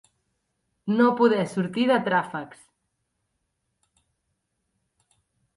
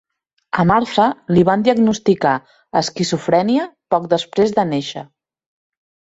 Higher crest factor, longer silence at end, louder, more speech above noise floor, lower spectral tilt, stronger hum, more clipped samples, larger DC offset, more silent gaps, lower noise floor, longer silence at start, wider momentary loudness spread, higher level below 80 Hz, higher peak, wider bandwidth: about the same, 20 dB vs 16 dB; first, 3.1 s vs 1.1 s; second, -23 LUFS vs -17 LUFS; first, 55 dB vs 20 dB; about the same, -6.5 dB/octave vs -6 dB/octave; neither; neither; neither; neither; first, -77 dBFS vs -37 dBFS; first, 0.85 s vs 0.55 s; first, 17 LU vs 8 LU; second, -72 dBFS vs -52 dBFS; second, -8 dBFS vs -2 dBFS; first, 11.5 kHz vs 8 kHz